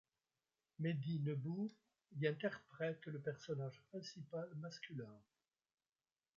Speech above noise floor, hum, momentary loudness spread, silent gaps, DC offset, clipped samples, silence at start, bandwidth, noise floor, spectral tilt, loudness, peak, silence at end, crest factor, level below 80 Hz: over 45 dB; none; 10 LU; none; under 0.1%; under 0.1%; 0.8 s; 7.4 kHz; under -90 dBFS; -6.5 dB/octave; -46 LUFS; -26 dBFS; 1.15 s; 20 dB; -88 dBFS